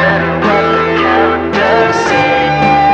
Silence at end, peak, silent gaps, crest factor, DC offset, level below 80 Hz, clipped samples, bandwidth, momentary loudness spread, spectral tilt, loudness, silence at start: 0 s; 0 dBFS; none; 10 dB; under 0.1%; -34 dBFS; under 0.1%; 8.8 kHz; 2 LU; -5.5 dB/octave; -10 LUFS; 0 s